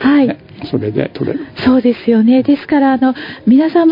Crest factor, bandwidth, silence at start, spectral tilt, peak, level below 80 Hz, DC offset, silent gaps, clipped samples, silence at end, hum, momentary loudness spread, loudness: 12 dB; 5.4 kHz; 0 s; -9.5 dB/octave; 0 dBFS; -50 dBFS; under 0.1%; none; under 0.1%; 0 s; none; 10 LU; -13 LUFS